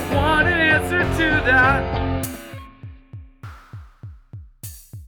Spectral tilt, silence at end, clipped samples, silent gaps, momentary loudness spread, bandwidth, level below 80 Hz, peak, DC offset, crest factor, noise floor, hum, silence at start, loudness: -5.5 dB/octave; 0 s; under 0.1%; none; 25 LU; over 20 kHz; -34 dBFS; -4 dBFS; under 0.1%; 18 dB; -41 dBFS; none; 0 s; -18 LUFS